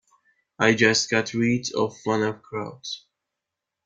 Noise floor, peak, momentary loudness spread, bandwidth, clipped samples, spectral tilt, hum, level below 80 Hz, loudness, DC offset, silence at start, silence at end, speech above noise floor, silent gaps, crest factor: -85 dBFS; -4 dBFS; 15 LU; 9.4 kHz; under 0.1%; -4 dB/octave; none; -64 dBFS; -23 LUFS; under 0.1%; 0.6 s; 0.85 s; 62 dB; none; 22 dB